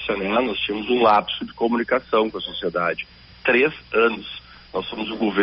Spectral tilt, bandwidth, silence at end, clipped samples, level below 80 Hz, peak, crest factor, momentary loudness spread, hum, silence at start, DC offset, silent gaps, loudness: -2 dB/octave; 5.8 kHz; 0 s; under 0.1%; -52 dBFS; -4 dBFS; 18 dB; 13 LU; none; 0 s; under 0.1%; none; -22 LUFS